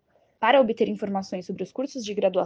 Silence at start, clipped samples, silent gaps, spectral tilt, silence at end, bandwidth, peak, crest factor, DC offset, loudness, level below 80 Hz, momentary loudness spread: 0.4 s; under 0.1%; none; -5.5 dB/octave; 0 s; 7.6 kHz; -6 dBFS; 20 dB; under 0.1%; -25 LUFS; -68 dBFS; 13 LU